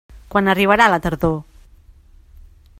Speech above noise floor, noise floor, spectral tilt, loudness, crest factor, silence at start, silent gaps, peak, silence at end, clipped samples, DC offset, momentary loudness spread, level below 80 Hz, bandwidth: 31 dB; -47 dBFS; -6 dB/octave; -16 LUFS; 20 dB; 0.15 s; none; 0 dBFS; 1.4 s; under 0.1%; under 0.1%; 9 LU; -40 dBFS; 16 kHz